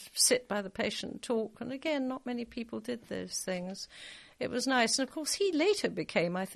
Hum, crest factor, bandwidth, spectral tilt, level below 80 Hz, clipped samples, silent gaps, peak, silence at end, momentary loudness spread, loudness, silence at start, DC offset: none; 20 dB; 13 kHz; -2.5 dB/octave; -68 dBFS; under 0.1%; none; -12 dBFS; 0 s; 12 LU; -32 LUFS; 0 s; under 0.1%